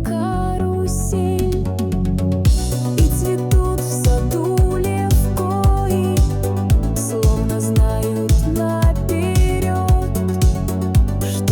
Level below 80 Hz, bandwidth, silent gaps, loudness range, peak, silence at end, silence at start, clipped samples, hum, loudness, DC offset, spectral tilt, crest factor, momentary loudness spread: -20 dBFS; 19 kHz; none; 1 LU; -6 dBFS; 0 s; 0 s; under 0.1%; none; -18 LUFS; under 0.1%; -6.5 dB/octave; 10 dB; 3 LU